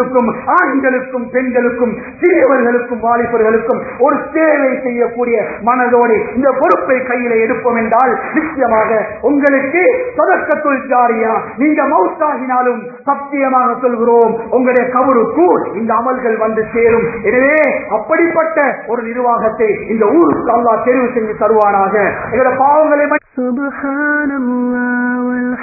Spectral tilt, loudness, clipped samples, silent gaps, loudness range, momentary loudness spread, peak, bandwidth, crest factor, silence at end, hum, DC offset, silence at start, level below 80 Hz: -10.5 dB/octave; -13 LUFS; under 0.1%; none; 1 LU; 6 LU; 0 dBFS; 2.7 kHz; 12 dB; 0 s; none; under 0.1%; 0 s; -48 dBFS